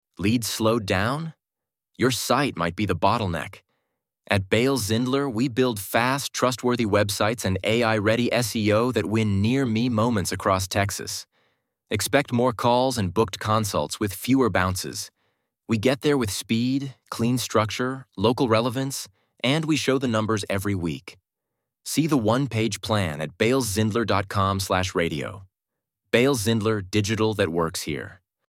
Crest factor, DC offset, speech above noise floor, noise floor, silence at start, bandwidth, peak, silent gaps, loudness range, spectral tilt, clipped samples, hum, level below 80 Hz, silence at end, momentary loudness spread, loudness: 22 dB; under 0.1%; 65 dB; -88 dBFS; 0.2 s; 17 kHz; -2 dBFS; none; 3 LU; -5 dB/octave; under 0.1%; none; -56 dBFS; 0.35 s; 8 LU; -24 LUFS